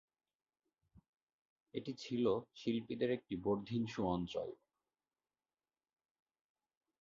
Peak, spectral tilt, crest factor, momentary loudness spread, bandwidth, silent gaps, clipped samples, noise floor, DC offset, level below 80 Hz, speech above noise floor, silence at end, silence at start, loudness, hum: -24 dBFS; -6 dB/octave; 20 dB; 10 LU; 7.4 kHz; none; under 0.1%; under -90 dBFS; under 0.1%; -70 dBFS; over 51 dB; 2.45 s; 1.75 s; -40 LUFS; none